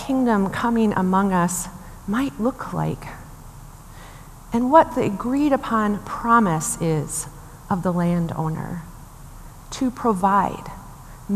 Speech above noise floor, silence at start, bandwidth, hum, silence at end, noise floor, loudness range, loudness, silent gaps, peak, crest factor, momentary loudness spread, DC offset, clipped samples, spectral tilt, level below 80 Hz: 20 dB; 0 s; 15 kHz; none; 0 s; -41 dBFS; 6 LU; -21 LUFS; none; 0 dBFS; 22 dB; 23 LU; under 0.1%; under 0.1%; -6 dB/octave; -44 dBFS